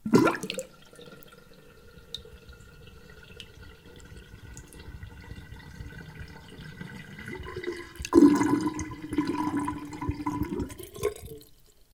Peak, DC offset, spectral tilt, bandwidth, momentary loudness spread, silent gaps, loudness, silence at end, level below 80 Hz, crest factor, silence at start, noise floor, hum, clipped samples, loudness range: -4 dBFS; under 0.1%; -6 dB/octave; 18 kHz; 26 LU; none; -28 LUFS; 0.55 s; -50 dBFS; 26 dB; 0.05 s; -56 dBFS; none; under 0.1%; 21 LU